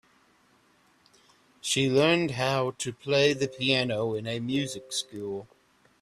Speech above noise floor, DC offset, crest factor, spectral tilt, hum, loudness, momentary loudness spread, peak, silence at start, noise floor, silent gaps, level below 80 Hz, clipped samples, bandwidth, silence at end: 37 dB; under 0.1%; 20 dB; -4 dB/octave; none; -27 LUFS; 13 LU; -10 dBFS; 1.65 s; -64 dBFS; none; -66 dBFS; under 0.1%; 14 kHz; 0.55 s